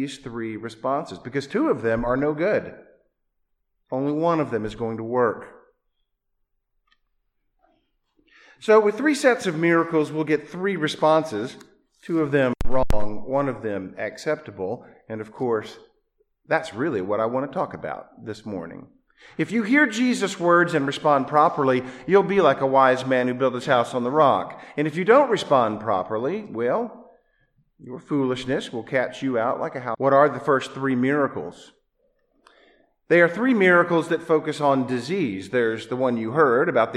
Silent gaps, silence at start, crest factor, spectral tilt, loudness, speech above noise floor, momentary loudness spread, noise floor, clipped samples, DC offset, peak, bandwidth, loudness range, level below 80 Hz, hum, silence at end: none; 0 s; 20 dB; -6 dB/octave; -22 LUFS; 52 dB; 14 LU; -74 dBFS; under 0.1%; under 0.1%; -4 dBFS; 12.5 kHz; 8 LU; -44 dBFS; none; 0 s